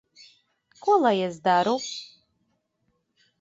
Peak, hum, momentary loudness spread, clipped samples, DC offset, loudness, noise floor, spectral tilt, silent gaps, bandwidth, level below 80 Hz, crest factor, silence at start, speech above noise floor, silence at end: -8 dBFS; none; 12 LU; under 0.1%; under 0.1%; -24 LUFS; -74 dBFS; -4.5 dB/octave; none; 8 kHz; -74 dBFS; 18 dB; 0.85 s; 51 dB; 1.35 s